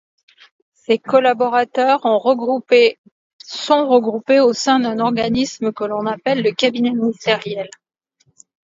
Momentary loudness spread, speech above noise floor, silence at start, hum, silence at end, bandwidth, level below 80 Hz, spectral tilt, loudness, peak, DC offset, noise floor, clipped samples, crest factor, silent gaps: 8 LU; 37 dB; 0.9 s; none; 1.05 s; 7.8 kHz; -58 dBFS; -4.5 dB/octave; -17 LUFS; 0 dBFS; under 0.1%; -53 dBFS; under 0.1%; 18 dB; 2.98-3.04 s, 3.11-3.39 s